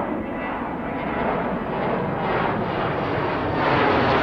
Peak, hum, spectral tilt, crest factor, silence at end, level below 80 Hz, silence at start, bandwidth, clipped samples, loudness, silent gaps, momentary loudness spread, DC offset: -6 dBFS; none; -8 dB/octave; 16 dB; 0 s; -44 dBFS; 0 s; 7.6 kHz; under 0.1%; -23 LUFS; none; 9 LU; under 0.1%